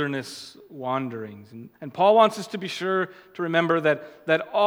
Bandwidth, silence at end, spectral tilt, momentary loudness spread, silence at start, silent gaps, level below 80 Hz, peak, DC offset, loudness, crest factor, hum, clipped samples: 16.5 kHz; 0 s; -5.5 dB/octave; 20 LU; 0 s; none; -78 dBFS; -4 dBFS; under 0.1%; -24 LUFS; 20 dB; none; under 0.1%